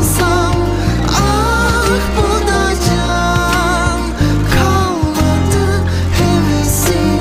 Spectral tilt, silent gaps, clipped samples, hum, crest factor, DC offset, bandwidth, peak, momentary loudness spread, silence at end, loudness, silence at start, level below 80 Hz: -5 dB/octave; none; under 0.1%; none; 12 dB; under 0.1%; 16 kHz; 0 dBFS; 3 LU; 0 s; -13 LUFS; 0 s; -20 dBFS